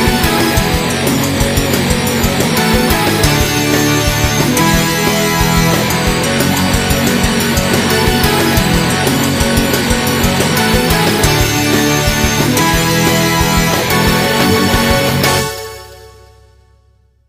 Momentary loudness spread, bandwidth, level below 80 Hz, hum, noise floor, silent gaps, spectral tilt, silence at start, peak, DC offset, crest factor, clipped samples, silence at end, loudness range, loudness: 2 LU; 16 kHz; -24 dBFS; none; -51 dBFS; none; -4 dB/octave; 0 s; 0 dBFS; under 0.1%; 12 dB; under 0.1%; 1.2 s; 1 LU; -12 LUFS